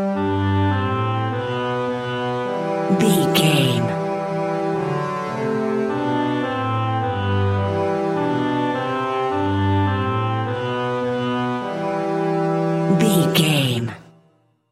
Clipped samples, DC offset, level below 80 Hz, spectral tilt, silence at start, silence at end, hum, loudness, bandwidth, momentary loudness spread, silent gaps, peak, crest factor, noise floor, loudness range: under 0.1%; under 0.1%; -58 dBFS; -6 dB/octave; 0 s; 0.7 s; none; -21 LUFS; 16 kHz; 7 LU; none; -2 dBFS; 18 dB; -59 dBFS; 2 LU